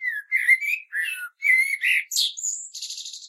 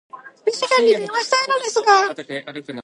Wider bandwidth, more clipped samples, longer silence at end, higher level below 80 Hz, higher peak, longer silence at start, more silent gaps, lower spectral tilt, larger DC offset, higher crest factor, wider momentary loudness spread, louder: first, 16 kHz vs 11.5 kHz; neither; about the same, 0 s vs 0 s; second, under -90 dBFS vs -78 dBFS; second, -6 dBFS vs 0 dBFS; second, 0 s vs 0.15 s; neither; second, 11 dB/octave vs -1.5 dB/octave; neither; about the same, 18 dB vs 18 dB; about the same, 13 LU vs 14 LU; second, -21 LUFS vs -18 LUFS